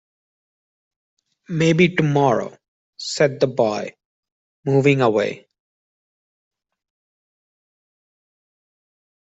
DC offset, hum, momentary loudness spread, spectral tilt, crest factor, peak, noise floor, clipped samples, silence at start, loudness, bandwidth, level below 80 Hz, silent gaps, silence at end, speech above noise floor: under 0.1%; none; 15 LU; -6 dB/octave; 20 dB; -2 dBFS; under -90 dBFS; under 0.1%; 1.5 s; -19 LUFS; 8.2 kHz; -62 dBFS; 2.68-2.93 s, 4.05-4.23 s, 4.32-4.63 s; 3.8 s; over 72 dB